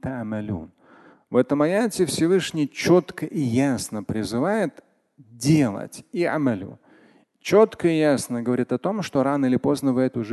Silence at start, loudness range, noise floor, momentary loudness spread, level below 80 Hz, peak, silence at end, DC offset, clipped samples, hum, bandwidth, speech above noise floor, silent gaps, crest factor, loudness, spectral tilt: 0.05 s; 3 LU; -56 dBFS; 10 LU; -54 dBFS; -4 dBFS; 0 s; under 0.1%; under 0.1%; none; 12.5 kHz; 34 dB; none; 18 dB; -22 LUFS; -6 dB/octave